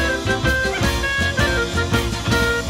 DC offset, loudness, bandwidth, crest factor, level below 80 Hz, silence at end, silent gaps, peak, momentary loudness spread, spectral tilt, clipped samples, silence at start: under 0.1%; -19 LUFS; 16.5 kHz; 14 dB; -28 dBFS; 0 s; none; -6 dBFS; 2 LU; -4.5 dB/octave; under 0.1%; 0 s